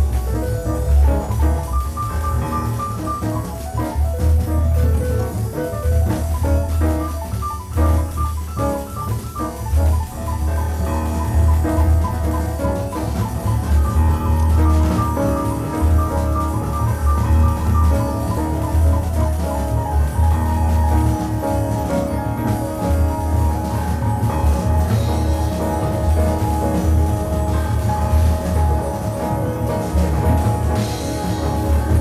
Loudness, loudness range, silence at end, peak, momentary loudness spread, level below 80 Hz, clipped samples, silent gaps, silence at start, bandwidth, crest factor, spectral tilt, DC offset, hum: -19 LUFS; 3 LU; 0 s; -6 dBFS; 6 LU; -20 dBFS; under 0.1%; none; 0 s; 14.5 kHz; 12 dB; -7 dB/octave; under 0.1%; none